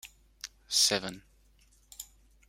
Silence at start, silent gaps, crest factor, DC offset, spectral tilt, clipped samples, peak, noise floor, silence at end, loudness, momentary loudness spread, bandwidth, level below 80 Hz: 0.05 s; none; 24 dB; under 0.1%; -0.5 dB/octave; under 0.1%; -12 dBFS; -64 dBFS; 0.45 s; -27 LUFS; 27 LU; 16.5 kHz; -64 dBFS